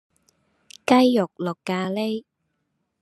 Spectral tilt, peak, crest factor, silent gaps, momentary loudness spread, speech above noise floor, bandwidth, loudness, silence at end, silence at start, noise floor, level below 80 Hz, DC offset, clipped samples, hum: -6 dB/octave; -2 dBFS; 22 dB; none; 14 LU; 54 dB; 12.5 kHz; -22 LUFS; 0.8 s; 0.9 s; -75 dBFS; -72 dBFS; under 0.1%; under 0.1%; none